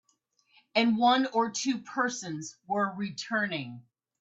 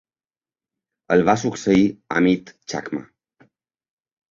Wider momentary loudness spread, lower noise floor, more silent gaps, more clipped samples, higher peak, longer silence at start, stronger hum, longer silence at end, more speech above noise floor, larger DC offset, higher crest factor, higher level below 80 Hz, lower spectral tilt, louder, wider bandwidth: about the same, 13 LU vs 13 LU; second, -72 dBFS vs under -90 dBFS; neither; neither; second, -12 dBFS vs -2 dBFS; second, 0.75 s vs 1.1 s; neither; second, 0.4 s vs 1.3 s; second, 43 dB vs over 71 dB; neither; about the same, 18 dB vs 22 dB; second, -74 dBFS vs -54 dBFS; second, -3.5 dB/octave vs -6 dB/octave; second, -29 LUFS vs -20 LUFS; about the same, 8.2 kHz vs 7.6 kHz